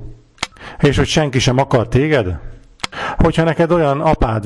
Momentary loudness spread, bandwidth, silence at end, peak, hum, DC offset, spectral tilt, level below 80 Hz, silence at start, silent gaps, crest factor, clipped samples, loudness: 12 LU; 12 kHz; 0 s; -4 dBFS; none; under 0.1%; -6 dB/octave; -28 dBFS; 0 s; none; 12 dB; under 0.1%; -16 LUFS